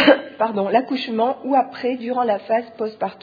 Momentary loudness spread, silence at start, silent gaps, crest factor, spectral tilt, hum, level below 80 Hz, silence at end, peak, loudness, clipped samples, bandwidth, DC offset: 7 LU; 0 s; none; 20 dB; -7 dB/octave; none; -68 dBFS; 0.1 s; 0 dBFS; -21 LUFS; under 0.1%; 5 kHz; under 0.1%